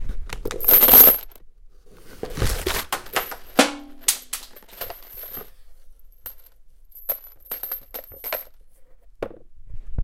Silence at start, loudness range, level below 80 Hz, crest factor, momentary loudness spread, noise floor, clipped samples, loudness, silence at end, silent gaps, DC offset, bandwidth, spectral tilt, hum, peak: 0 s; 18 LU; -36 dBFS; 24 dB; 26 LU; -46 dBFS; under 0.1%; -17 LUFS; 0 s; none; under 0.1%; 17 kHz; -2.5 dB/octave; none; 0 dBFS